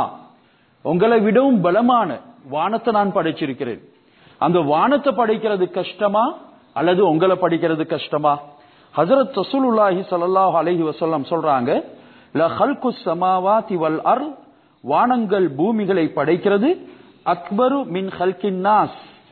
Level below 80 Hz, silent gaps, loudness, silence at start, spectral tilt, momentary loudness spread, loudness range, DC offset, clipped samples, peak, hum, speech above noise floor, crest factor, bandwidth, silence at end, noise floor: -64 dBFS; none; -19 LUFS; 0 s; -10.5 dB/octave; 9 LU; 2 LU; under 0.1%; under 0.1%; -4 dBFS; none; 37 dB; 16 dB; 4.5 kHz; 0.25 s; -55 dBFS